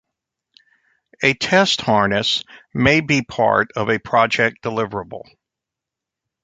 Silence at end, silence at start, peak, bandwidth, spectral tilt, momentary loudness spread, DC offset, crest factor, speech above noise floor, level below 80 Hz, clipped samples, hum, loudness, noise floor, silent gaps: 1.25 s; 1.2 s; -2 dBFS; 9.4 kHz; -4.5 dB/octave; 10 LU; under 0.1%; 20 dB; 67 dB; -50 dBFS; under 0.1%; none; -17 LUFS; -85 dBFS; none